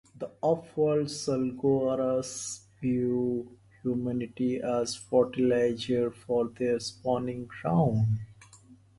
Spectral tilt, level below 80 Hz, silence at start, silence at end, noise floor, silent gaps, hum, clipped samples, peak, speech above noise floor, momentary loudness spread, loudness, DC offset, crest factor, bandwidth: -6.5 dB/octave; -60 dBFS; 0.15 s; 0.25 s; -56 dBFS; none; none; under 0.1%; -12 dBFS; 28 dB; 9 LU; -29 LUFS; under 0.1%; 18 dB; 11.5 kHz